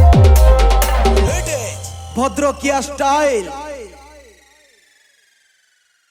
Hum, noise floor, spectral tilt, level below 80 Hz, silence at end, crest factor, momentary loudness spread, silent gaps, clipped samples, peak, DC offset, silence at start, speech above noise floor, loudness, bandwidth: none; -59 dBFS; -5.5 dB/octave; -18 dBFS; 2.25 s; 14 dB; 19 LU; none; under 0.1%; 0 dBFS; under 0.1%; 0 s; 42 dB; -15 LUFS; 17 kHz